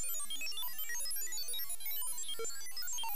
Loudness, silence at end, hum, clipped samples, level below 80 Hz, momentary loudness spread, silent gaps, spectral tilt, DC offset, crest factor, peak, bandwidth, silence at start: -38 LUFS; 0 s; none; under 0.1%; -80 dBFS; 3 LU; none; 1 dB/octave; 2%; 8 dB; -28 dBFS; 15.5 kHz; 0 s